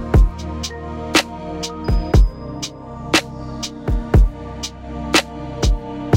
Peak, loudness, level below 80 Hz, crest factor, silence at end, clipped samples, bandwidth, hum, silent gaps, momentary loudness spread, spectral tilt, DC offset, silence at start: 0 dBFS; -20 LUFS; -20 dBFS; 18 dB; 0 s; under 0.1%; 16 kHz; none; none; 12 LU; -4.5 dB/octave; under 0.1%; 0 s